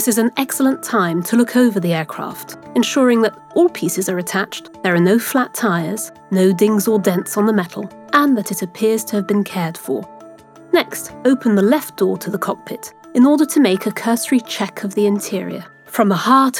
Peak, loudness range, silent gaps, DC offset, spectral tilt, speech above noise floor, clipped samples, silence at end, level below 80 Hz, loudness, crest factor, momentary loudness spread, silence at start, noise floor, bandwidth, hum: 0 dBFS; 2 LU; none; under 0.1%; -5 dB/octave; 24 dB; under 0.1%; 0 s; -66 dBFS; -17 LUFS; 16 dB; 11 LU; 0 s; -41 dBFS; 18 kHz; none